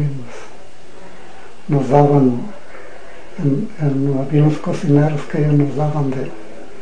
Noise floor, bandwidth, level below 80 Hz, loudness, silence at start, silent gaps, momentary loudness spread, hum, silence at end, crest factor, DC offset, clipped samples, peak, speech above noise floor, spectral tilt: -42 dBFS; 9.4 kHz; -54 dBFS; -17 LUFS; 0 s; none; 24 LU; none; 0 s; 18 dB; 6%; under 0.1%; 0 dBFS; 26 dB; -9 dB/octave